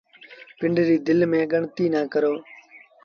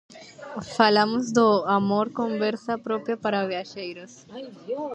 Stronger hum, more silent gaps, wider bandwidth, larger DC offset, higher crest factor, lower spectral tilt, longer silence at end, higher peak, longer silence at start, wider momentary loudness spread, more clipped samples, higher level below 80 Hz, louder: neither; neither; second, 6.6 kHz vs 8.8 kHz; neither; second, 14 dB vs 22 dB; first, -8 dB/octave vs -5 dB/octave; first, 0.25 s vs 0 s; second, -10 dBFS vs -4 dBFS; first, 0.3 s vs 0.1 s; second, 6 LU vs 20 LU; neither; about the same, -64 dBFS vs -68 dBFS; about the same, -22 LUFS vs -24 LUFS